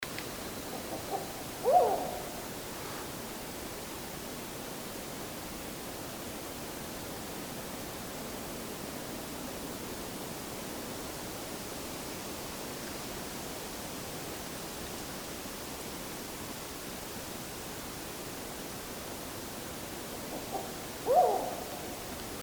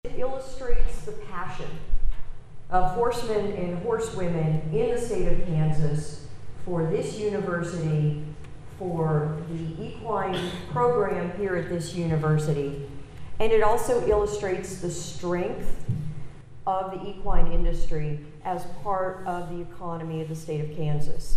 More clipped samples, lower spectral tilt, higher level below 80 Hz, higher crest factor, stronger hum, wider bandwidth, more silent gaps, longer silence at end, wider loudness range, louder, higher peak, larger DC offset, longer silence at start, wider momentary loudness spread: neither; second, -3.5 dB/octave vs -6.5 dB/octave; second, -56 dBFS vs -32 dBFS; first, 24 dB vs 18 dB; neither; first, over 20 kHz vs 11 kHz; neither; about the same, 0 s vs 0 s; about the same, 6 LU vs 5 LU; second, -37 LUFS vs -28 LUFS; second, -14 dBFS vs -4 dBFS; neither; about the same, 0 s vs 0.05 s; second, 6 LU vs 12 LU